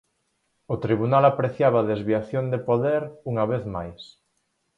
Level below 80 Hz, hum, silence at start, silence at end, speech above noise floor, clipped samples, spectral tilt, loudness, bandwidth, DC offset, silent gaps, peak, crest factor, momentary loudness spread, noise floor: -54 dBFS; none; 0.7 s; 0.7 s; 50 dB; under 0.1%; -9 dB/octave; -23 LUFS; 7.6 kHz; under 0.1%; none; -6 dBFS; 20 dB; 14 LU; -73 dBFS